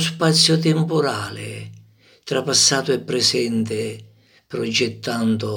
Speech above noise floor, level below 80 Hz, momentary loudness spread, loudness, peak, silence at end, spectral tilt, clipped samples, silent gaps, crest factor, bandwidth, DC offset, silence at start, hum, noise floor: 31 dB; -66 dBFS; 17 LU; -19 LUFS; -2 dBFS; 0 s; -3.5 dB/octave; under 0.1%; none; 20 dB; 18.5 kHz; under 0.1%; 0 s; none; -50 dBFS